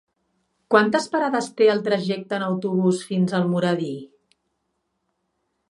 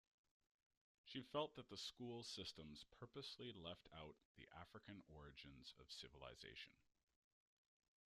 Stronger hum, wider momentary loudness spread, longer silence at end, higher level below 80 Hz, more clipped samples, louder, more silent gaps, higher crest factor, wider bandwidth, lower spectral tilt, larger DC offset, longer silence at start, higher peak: neither; second, 8 LU vs 12 LU; first, 1.65 s vs 1.35 s; first, -72 dBFS vs -78 dBFS; neither; first, -22 LUFS vs -56 LUFS; second, none vs 4.25-4.35 s; about the same, 22 dB vs 26 dB; second, 11.5 kHz vs 13 kHz; first, -6 dB/octave vs -4 dB/octave; neither; second, 0.7 s vs 1.05 s; first, -2 dBFS vs -32 dBFS